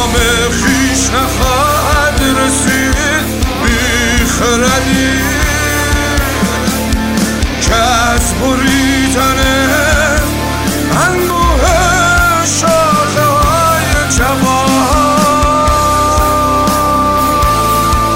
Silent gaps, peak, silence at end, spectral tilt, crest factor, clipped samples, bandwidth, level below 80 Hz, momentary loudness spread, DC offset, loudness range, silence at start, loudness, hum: none; 0 dBFS; 0 s; -4 dB/octave; 10 dB; under 0.1%; 16.5 kHz; -20 dBFS; 4 LU; 0.8%; 2 LU; 0 s; -10 LUFS; none